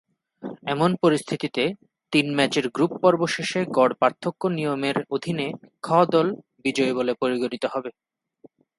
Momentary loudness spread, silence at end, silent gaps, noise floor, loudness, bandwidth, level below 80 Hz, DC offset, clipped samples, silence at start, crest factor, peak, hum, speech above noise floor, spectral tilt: 10 LU; 0.9 s; none; -55 dBFS; -23 LUFS; 11.5 kHz; -68 dBFS; under 0.1%; under 0.1%; 0.4 s; 20 dB; -4 dBFS; none; 32 dB; -5.5 dB/octave